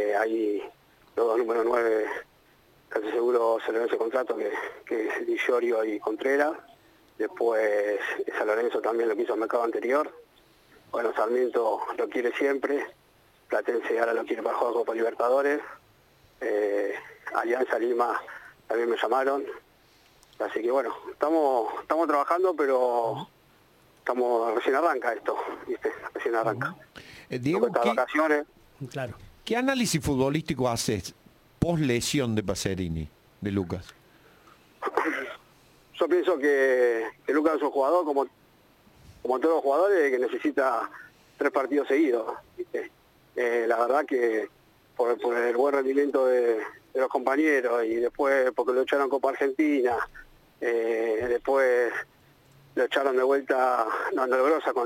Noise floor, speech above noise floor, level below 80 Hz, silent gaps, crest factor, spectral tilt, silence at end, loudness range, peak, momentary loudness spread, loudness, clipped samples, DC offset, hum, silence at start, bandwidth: -60 dBFS; 35 dB; -58 dBFS; none; 16 dB; -5.5 dB/octave; 0 s; 3 LU; -10 dBFS; 12 LU; -26 LUFS; under 0.1%; under 0.1%; none; 0 s; 16.5 kHz